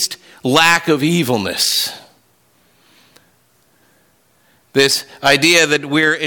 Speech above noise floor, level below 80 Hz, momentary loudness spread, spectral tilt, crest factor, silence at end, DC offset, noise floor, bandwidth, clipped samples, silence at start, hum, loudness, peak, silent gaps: 42 dB; -58 dBFS; 10 LU; -3 dB/octave; 16 dB; 0 s; under 0.1%; -57 dBFS; 19 kHz; under 0.1%; 0 s; none; -14 LUFS; -2 dBFS; none